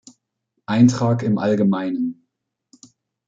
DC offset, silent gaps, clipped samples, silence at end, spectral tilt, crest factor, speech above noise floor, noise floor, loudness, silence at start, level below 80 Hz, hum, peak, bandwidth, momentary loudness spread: under 0.1%; none; under 0.1%; 1.15 s; -7 dB/octave; 18 dB; 59 dB; -76 dBFS; -19 LUFS; 0.7 s; -60 dBFS; none; -2 dBFS; 7.8 kHz; 11 LU